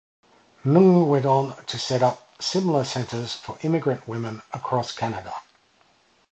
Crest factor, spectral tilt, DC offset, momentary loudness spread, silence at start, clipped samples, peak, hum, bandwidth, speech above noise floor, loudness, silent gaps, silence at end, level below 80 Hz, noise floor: 20 dB; -6.5 dB/octave; under 0.1%; 15 LU; 0.65 s; under 0.1%; -4 dBFS; none; 8.6 kHz; 39 dB; -23 LUFS; none; 0.9 s; -62 dBFS; -61 dBFS